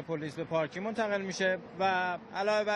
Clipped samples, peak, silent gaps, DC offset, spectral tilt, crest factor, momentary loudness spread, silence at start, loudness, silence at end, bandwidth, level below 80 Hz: under 0.1%; -18 dBFS; none; under 0.1%; -4.5 dB/octave; 14 dB; 5 LU; 0 s; -32 LUFS; 0 s; 11 kHz; -70 dBFS